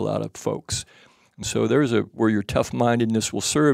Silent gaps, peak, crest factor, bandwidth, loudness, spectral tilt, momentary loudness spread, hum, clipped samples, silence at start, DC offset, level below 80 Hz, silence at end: none; -6 dBFS; 16 dB; 16 kHz; -23 LUFS; -5 dB/octave; 9 LU; none; under 0.1%; 0 s; under 0.1%; -50 dBFS; 0 s